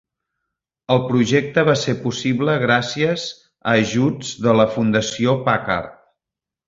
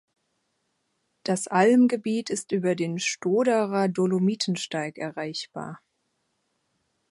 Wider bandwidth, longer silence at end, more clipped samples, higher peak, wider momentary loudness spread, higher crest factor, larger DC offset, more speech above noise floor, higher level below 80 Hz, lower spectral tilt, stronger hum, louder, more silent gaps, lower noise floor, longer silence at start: second, 7.8 kHz vs 11.5 kHz; second, 0.75 s vs 1.35 s; neither; first, -2 dBFS vs -6 dBFS; second, 7 LU vs 13 LU; about the same, 18 dB vs 20 dB; neither; first, 69 dB vs 51 dB; first, -52 dBFS vs -76 dBFS; about the same, -5.5 dB/octave vs -5 dB/octave; neither; first, -19 LUFS vs -25 LUFS; neither; first, -87 dBFS vs -75 dBFS; second, 0.9 s vs 1.25 s